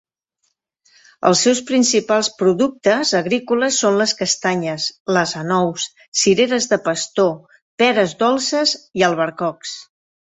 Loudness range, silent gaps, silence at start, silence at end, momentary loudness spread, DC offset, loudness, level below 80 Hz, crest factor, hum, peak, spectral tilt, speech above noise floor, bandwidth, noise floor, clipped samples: 2 LU; 5.00-5.06 s, 6.08-6.12 s, 7.62-7.78 s; 1.2 s; 0.5 s; 7 LU; under 0.1%; -17 LUFS; -62 dBFS; 18 dB; none; 0 dBFS; -3 dB/octave; 53 dB; 8.4 kHz; -70 dBFS; under 0.1%